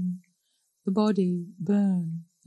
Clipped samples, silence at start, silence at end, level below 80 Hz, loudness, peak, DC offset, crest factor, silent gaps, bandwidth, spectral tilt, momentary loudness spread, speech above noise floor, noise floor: under 0.1%; 0 s; 0.25 s; -76 dBFS; -27 LUFS; -12 dBFS; under 0.1%; 16 dB; none; 9.6 kHz; -9 dB/octave; 11 LU; 49 dB; -74 dBFS